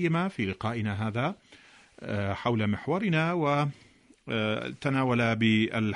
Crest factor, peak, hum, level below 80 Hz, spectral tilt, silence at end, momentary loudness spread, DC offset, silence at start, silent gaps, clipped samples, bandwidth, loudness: 16 dB; -12 dBFS; none; -62 dBFS; -7 dB/octave; 0 s; 9 LU; under 0.1%; 0 s; none; under 0.1%; 10.5 kHz; -28 LUFS